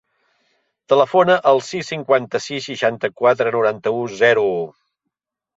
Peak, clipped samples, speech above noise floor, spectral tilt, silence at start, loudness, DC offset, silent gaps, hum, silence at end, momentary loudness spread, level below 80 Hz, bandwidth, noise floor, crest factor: -2 dBFS; under 0.1%; 62 dB; -4.5 dB/octave; 0.9 s; -18 LUFS; under 0.1%; none; none; 0.9 s; 11 LU; -66 dBFS; 8 kHz; -80 dBFS; 16 dB